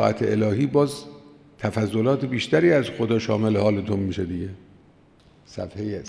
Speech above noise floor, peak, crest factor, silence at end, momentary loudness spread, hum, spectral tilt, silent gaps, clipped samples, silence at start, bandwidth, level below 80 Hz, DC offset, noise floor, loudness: 32 dB; -4 dBFS; 18 dB; 0 s; 15 LU; none; -7 dB/octave; none; under 0.1%; 0 s; 11 kHz; -56 dBFS; under 0.1%; -54 dBFS; -23 LUFS